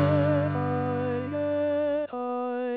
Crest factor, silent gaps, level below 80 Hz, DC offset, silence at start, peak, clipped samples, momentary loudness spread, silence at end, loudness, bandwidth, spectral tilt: 14 dB; none; -72 dBFS; under 0.1%; 0 s; -12 dBFS; under 0.1%; 6 LU; 0 s; -27 LUFS; 4.7 kHz; -10.5 dB/octave